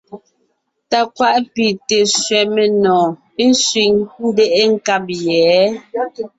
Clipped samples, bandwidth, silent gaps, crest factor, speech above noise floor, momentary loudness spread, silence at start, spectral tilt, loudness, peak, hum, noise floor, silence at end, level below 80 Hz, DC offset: under 0.1%; 8.2 kHz; none; 14 dB; 51 dB; 6 LU; 0.1 s; -3 dB/octave; -14 LUFS; -2 dBFS; none; -66 dBFS; 0.1 s; -58 dBFS; under 0.1%